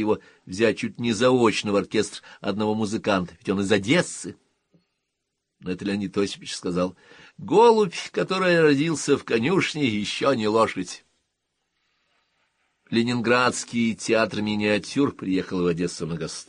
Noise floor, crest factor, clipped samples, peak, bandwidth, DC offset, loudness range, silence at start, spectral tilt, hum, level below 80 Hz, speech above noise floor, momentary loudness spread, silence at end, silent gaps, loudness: -79 dBFS; 18 dB; under 0.1%; -6 dBFS; 10.5 kHz; under 0.1%; 6 LU; 0 s; -5 dB/octave; none; -60 dBFS; 57 dB; 12 LU; 0.05 s; none; -23 LUFS